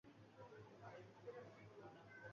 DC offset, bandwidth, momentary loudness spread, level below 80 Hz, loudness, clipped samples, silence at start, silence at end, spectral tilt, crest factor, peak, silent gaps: under 0.1%; 7 kHz; 4 LU; -86 dBFS; -61 LUFS; under 0.1%; 0.05 s; 0 s; -5 dB/octave; 16 dB; -44 dBFS; none